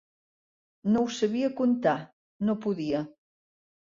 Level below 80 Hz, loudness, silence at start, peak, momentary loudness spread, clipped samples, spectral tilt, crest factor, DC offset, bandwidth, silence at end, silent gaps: -68 dBFS; -28 LUFS; 0.85 s; -12 dBFS; 8 LU; under 0.1%; -6 dB/octave; 18 dB; under 0.1%; 7.6 kHz; 0.85 s; 2.13-2.39 s